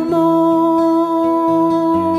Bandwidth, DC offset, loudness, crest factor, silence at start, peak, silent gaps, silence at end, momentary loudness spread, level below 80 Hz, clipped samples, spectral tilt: 11 kHz; under 0.1%; -14 LUFS; 10 dB; 0 s; -4 dBFS; none; 0 s; 2 LU; -52 dBFS; under 0.1%; -8 dB/octave